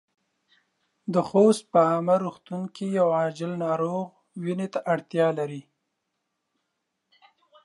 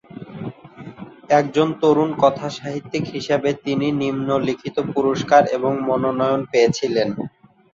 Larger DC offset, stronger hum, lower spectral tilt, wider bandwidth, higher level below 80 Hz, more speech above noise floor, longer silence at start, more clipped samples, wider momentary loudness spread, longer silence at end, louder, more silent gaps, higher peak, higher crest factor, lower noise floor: neither; neither; about the same, -7 dB/octave vs -6 dB/octave; first, 11.5 kHz vs 7.6 kHz; second, -76 dBFS vs -58 dBFS; first, 55 dB vs 20 dB; first, 1.05 s vs 0.15 s; neither; about the same, 15 LU vs 17 LU; first, 2.05 s vs 0.45 s; second, -25 LUFS vs -19 LUFS; neither; second, -6 dBFS vs -2 dBFS; about the same, 20 dB vs 18 dB; first, -80 dBFS vs -39 dBFS